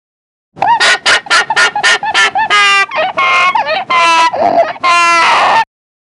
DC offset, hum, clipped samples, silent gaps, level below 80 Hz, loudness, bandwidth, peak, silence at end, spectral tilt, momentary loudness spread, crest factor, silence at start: under 0.1%; none; under 0.1%; none; -56 dBFS; -9 LUFS; 11.5 kHz; 0 dBFS; 0.5 s; -0.5 dB/octave; 6 LU; 10 dB; 0.55 s